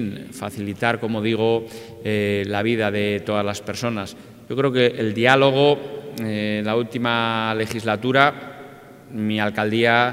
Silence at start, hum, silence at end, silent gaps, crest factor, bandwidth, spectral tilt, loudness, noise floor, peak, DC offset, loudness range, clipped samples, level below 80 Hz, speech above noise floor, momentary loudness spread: 0 s; none; 0 s; none; 22 dB; 16 kHz; -5.5 dB/octave; -21 LUFS; -42 dBFS; 0 dBFS; under 0.1%; 3 LU; under 0.1%; -62 dBFS; 21 dB; 14 LU